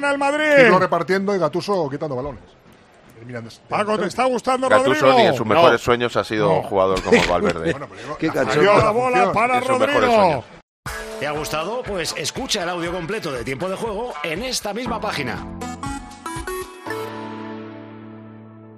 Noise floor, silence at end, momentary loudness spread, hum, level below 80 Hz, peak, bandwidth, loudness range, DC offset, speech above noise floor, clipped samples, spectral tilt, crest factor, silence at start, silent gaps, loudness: -49 dBFS; 0 s; 17 LU; none; -46 dBFS; 0 dBFS; 15 kHz; 10 LU; under 0.1%; 30 dB; under 0.1%; -4.5 dB/octave; 20 dB; 0 s; 10.63-10.83 s; -19 LUFS